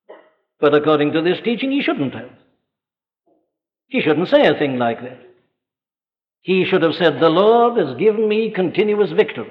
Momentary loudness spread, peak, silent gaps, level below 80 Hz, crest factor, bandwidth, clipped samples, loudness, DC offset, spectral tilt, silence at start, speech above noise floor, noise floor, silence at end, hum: 9 LU; -2 dBFS; none; -66 dBFS; 16 dB; 5.6 kHz; under 0.1%; -17 LUFS; under 0.1%; -8 dB/octave; 0.1 s; over 74 dB; under -90 dBFS; 0 s; none